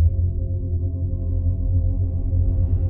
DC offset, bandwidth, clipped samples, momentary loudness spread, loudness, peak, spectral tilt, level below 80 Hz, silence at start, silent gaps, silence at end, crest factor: under 0.1%; 1.1 kHz; under 0.1%; 4 LU; -23 LUFS; -8 dBFS; -15.5 dB/octave; -24 dBFS; 0 s; none; 0 s; 12 dB